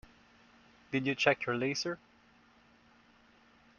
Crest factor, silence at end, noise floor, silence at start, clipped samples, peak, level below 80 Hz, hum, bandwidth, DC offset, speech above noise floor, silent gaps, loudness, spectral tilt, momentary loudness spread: 28 dB; 1.8 s; -64 dBFS; 0.9 s; under 0.1%; -10 dBFS; -70 dBFS; none; 7.4 kHz; under 0.1%; 32 dB; none; -33 LUFS; -3 dB/octave; 10 LU